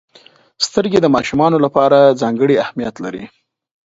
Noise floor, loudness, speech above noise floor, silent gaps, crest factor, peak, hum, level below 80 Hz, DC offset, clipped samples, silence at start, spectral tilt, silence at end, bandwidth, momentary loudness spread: -48 dBFS; -14 LUFS; 34 dB; none; 16 dB; 0 dBFS; none; -52 dBFS; under 0.1%; under 0.1%; 0.6 s; -5.5 dB/octave; 0.6 s; 8 kHz; 14 LU